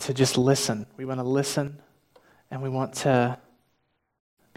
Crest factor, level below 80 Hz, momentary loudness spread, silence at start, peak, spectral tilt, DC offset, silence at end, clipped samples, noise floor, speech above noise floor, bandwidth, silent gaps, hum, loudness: 20 dB; -66 dBFS; 13 LU; 0 s; -8 dBFS; -5 dB/octave; under 0.1%; 1.2 s; under 0.1%; -73 dBFS; 48 dB; 16 kHz; none; none; -26 LUFS